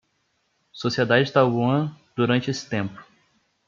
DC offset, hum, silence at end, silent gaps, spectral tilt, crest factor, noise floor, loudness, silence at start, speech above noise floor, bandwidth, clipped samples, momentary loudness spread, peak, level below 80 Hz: under 0.1%; none; 0.65 s; none; -6 dB/octave; 20 dB; -70 dBFS; -23 LUFS; 0.75 s; 49 dB; 7.4 kHz; under 0.1%; 10 LU; -4 dBFS; -66 dBFS